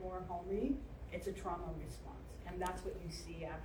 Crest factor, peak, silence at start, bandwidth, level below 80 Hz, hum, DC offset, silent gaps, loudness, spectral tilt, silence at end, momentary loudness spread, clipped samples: 18 dB; -26 dBFS; 0 s; over 20 kHz; -52 dBFS; none; under 0.1%; none; -44 LUFS; -6 dB/octave; 0 s; 10 LU; under 0.1%